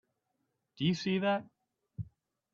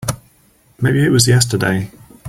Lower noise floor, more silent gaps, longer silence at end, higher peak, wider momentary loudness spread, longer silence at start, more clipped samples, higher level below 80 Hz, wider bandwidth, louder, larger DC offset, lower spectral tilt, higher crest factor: first, -82 dBFS vs -53 dBFS; neither; first, 0.45 s vs 0 s; second, -18 dBFS vs 0 dBFS; about the same, 17 LU vs 16 LU; first, 0.8 s vs 0 s; neither; second, -68 dBFS vs -44 dBFS; second, 7.4 kHz vs 16 kHz; second, -33 LUFS vs -15 LUFS; neither; first, -6.5 dB/octave vs -4.5 dB/octave; about the same, 18 dB vs 16 dB